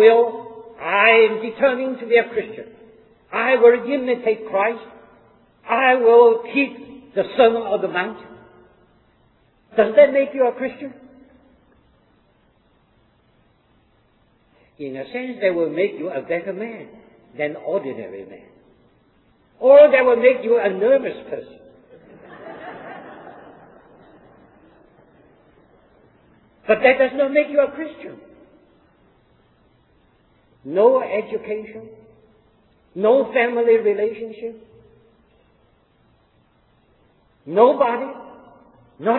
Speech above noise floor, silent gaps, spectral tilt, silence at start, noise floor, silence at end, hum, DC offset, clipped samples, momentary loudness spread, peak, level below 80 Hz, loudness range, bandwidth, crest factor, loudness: 42 dB; none; -8.5 dB/octave; 0 s; -59 dBFS; 0 s; none; under 0.1%; under 0.1%; 23 LU; -2 dBFS; -64 dBFS; 13 LU; 4.2 kHz; 20 dB; -18 LUFS